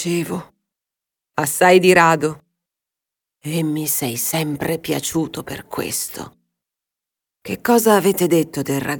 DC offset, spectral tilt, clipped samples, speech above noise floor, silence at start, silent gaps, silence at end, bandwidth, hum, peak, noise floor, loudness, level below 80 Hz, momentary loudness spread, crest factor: under 0.1%; -4.5 dB/octave; under 0.1%; 68 dB; 0 s; none; 0 s; 19.5 kHz; none; 0 dBFS; -86 dBFS; -18 LUFS; -56 dBFS; 17 LU; 18 dB